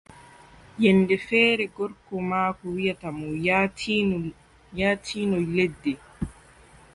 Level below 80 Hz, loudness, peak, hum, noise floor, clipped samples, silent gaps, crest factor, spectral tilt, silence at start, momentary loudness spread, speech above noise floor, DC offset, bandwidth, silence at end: -52 dBFS; -24 LUFS; -6 dBFS; none; -52 dBFS; under 0.1%; none; 20 dB; -6 dB/octave; 0.15 s; 15 LU; 28 dB; under 0.1%; 11.5 kHz; 0.65 s